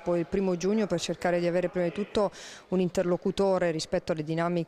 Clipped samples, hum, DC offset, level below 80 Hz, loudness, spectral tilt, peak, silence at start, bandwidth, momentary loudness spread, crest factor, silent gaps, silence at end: under 0.1%; none; under 0.1%; -56 dBFS; -28 LUFS; -6 dB/octave; -14 dBFS; 0 s; 12.5 kHz; 4 LU; 14 dB; none; 0 s